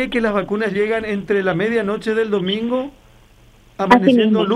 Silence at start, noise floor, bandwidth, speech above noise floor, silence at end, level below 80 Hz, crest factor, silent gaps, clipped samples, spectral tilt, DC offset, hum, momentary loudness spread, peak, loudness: 0 s; -48 dBFS; 11 kHz; 31 dB; 0 s; -48 dBFS; 18 dB; none; under 0.1%; -6.5 dB/octave; under 0.1%; none; 9 LU; 0 dBFS; -18 LUFS